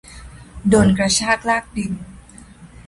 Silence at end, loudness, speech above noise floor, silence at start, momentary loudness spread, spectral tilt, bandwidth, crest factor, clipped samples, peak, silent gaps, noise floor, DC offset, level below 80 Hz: 0.05 s; -17 LUFS; 25 dB; 0.1 s; 14 LU; -4.5 dB/octave; 11.5 kHz; 18 dB; under 0.1%; -2 dBFS; none; -42 dBFS; under 0.1%; -40 dBFS